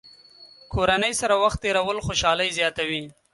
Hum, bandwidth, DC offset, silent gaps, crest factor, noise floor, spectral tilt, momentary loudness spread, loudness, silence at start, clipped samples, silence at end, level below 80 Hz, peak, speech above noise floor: none; 11.5 kHz; under 0.1%; none; 18 dB; -50 dBFS; -3 dB/octave; 7 LU; -23 LUFS; 0.05 s; under 0.1%; 0.2 s; -44 dBFS; -6 dBFS; 27 dB